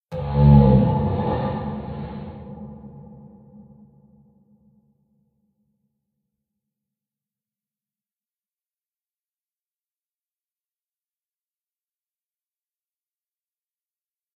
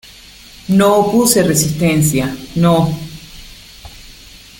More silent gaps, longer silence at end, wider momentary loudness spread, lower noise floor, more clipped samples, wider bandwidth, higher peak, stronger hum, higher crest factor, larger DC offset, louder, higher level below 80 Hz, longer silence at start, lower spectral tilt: neither; first, 11.35 s vs 0.5 s; first, 25 LU vs 21 LU; first, under -90 dBFS vs -39 dBFS; neither; second, 4.5 kHz vs 17 kHz; about the same, -2 dBFS vs 0 dBFS; neither; first, 24 dB vs 16 dB; neither; second, -19 LUFS vs -13 LUFS; about the same, -36 dBFS vs -40 dBFS; second, 0.1 s vs 0.7 s; first, -10 dB/octave vs -5 dB/octave